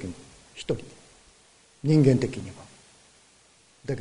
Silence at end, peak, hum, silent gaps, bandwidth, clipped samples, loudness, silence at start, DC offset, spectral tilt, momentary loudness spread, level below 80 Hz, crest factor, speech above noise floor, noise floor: 0 s; -6 dBFS; none; none; 10.5 kHz; under 0.1%; -25 LUFS; 0 s; under 0.1%; -7.5 dB/octave; 26 LU; -54 dBFS; 22 dB; 35 dB; -59 dBFS